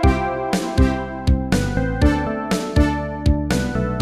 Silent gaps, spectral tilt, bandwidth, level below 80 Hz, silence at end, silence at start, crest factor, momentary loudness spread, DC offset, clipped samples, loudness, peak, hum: none; -6.5 dB/octave; 14.5 kHz; -24 dBFS; 0 s; 0 s; 16 dB; 4 LU; 0.5%; under 0.1%; -20 LUFS; -4 dBFS; none